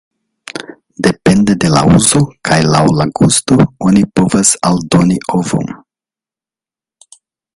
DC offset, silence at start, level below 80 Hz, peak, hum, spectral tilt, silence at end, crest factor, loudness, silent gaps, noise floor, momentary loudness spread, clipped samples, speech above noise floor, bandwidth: under 0.1%; 0.55 s; -38 dBFS; 0 dBFS; none; -5 dB/octave; 1.8 s; 12 dB; -11 LUFS; none; -90 dBFS; 10 LU; under 0.1%; 79 dB; 11.5 kHz